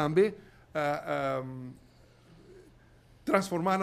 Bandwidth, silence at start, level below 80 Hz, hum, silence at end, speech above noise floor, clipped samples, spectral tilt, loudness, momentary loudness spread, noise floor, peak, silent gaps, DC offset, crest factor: 15.5 kHz; 0 s; -64 dBFS; none; 0 s; 29 dB; under 0.1%; -6 dB/octave; -31 LUFS; 17 LU; -59 dBFS; -10 dBFS; none; under 0.1%; 22 dB